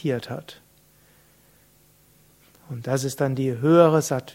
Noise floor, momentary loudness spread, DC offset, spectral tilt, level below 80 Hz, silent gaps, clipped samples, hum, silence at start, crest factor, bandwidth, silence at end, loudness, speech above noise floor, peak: -58 dBFS; 19 LU; under 0.1%; -6.5 dB/octave; -64 dBFS; none; under 0.1%; none; 0.05 s; 22 dB; 16.5 kHz; 0.05 s; -21 LUFS; 36 dB; -2 dBFS